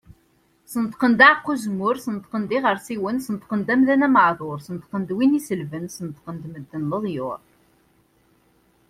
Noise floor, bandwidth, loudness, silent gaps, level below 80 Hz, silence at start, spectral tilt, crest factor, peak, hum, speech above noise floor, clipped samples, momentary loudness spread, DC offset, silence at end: -62 dBFS; 14.5 kHz; -21 LUFS; none; -62 dBFS; 0.7 s; -5.5 dB/octave; 22 dB; 0 dBFS; none; 41 dB; under 0.1%; 18 LU; under 0.1%; 1.5 s